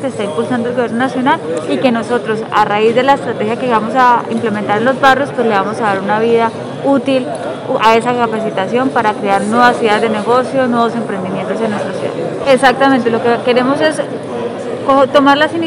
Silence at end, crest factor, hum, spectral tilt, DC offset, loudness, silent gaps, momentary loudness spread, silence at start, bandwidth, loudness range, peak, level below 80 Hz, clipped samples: 0 s; 12 dB; none; -5.5 dB/octave; under 0.1%; -13 LUFS; none; 9 LU; 0 s; 12.5 kHz; 2 LU; 0 dBFS; -56 dBFS; 0.5%